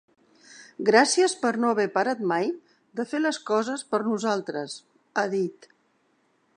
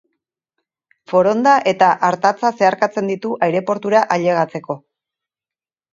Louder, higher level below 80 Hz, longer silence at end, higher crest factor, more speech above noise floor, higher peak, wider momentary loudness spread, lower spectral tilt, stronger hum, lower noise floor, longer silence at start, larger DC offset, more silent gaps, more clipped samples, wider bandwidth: second, -25 LUFS vs -16 LUFS; second, -82 dBFS vs -68 dBFS; about the same, 1.05 s vs 1.15 s; first, 24 dB vs 18 dB; second, 43 dB vs over 74 dB; about the same, -2 dBFS vs 0 dBFS; first, 14 LU vs 8 LU; second, -3.5 dB/octave vs -5.5 dB/octave; neither; second, -68 dBFS vs under -90 dBFS; second, 0.5 s vs 1.1 s; neither; neither; neither; first, 10.5 kHz vs 7.6 kHz